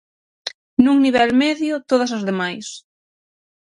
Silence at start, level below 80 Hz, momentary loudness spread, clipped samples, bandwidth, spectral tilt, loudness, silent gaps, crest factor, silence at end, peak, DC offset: 0.45 s; -56 dBFS; 17 LU; under 0.1%; 11 kHz; -4.5 dB/octave; -18 LUFS; 0.54-0.77 s; 20 dB; 1 s; 0 dBFS; under 0.1%